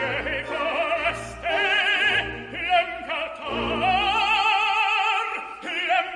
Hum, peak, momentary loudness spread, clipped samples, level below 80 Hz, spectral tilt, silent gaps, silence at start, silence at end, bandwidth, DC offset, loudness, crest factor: none; -8 dBFS; 10 LU; under 0.1%; -48 dBFS; -3 dB/octave; none; 0 s; 0 s; 11.5 kHz; under 0.1%; -22 LUFS; 16 dB